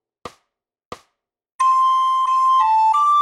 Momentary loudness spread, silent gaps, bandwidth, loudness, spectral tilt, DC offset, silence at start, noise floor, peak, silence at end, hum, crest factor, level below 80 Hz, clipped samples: 3 LU; 0.85-0.92 s, 1.54-1.59 s; 11 kHz; -16 LUFS; -0.5 dB/octave; under 0.1%; 0.25 s; -76 dBFS; -8 dBFS; 0 s; none; 12 dB; -64 dBFS; under 0.1%